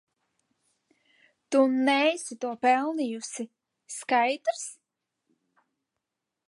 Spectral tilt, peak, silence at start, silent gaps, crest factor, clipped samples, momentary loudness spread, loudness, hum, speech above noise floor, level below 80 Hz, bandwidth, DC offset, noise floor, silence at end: -2.5 dB/octave; -10 dBFS; 1.5 s; none; 18 dB; under 0.1%; 16 LU; -26 LUFS; none; 59 dB; -86 dBFS; 11.5 kHz; under 0.1%; -85 dBFS; 1.75 s